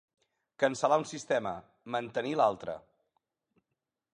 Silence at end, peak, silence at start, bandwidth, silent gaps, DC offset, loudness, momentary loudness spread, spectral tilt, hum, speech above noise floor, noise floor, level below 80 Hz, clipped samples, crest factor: 1.35 s; -12 dBFS; 0.6 s; 10.5 kHz; none; under 0.1%; -31 LUFS; 13 LU; -4.5 dB/octave; none; 56 dB; -87 dBFS; -72 dBFS; under 0.1%; 20 dB